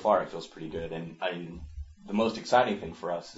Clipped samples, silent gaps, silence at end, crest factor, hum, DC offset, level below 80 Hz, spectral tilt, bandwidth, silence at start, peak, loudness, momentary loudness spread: under 0.1%; none; 0 s; 20 dB; none; under 0.1%; -50 dBFS; -5.5 dB/octave; 8 kHz; 0 s; -10 dBFS; -30 LUFS; 17 LU